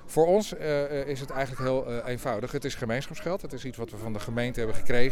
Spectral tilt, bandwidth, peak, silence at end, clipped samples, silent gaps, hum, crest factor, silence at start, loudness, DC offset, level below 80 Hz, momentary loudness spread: -5.5 dB/octave; 14.5 kHz; -8 dBFS; 0 s; under 0.1%; none; none; 18 dB; 0 s; -30 LUFS; under 0.1%; -42 dBFS; 11 LU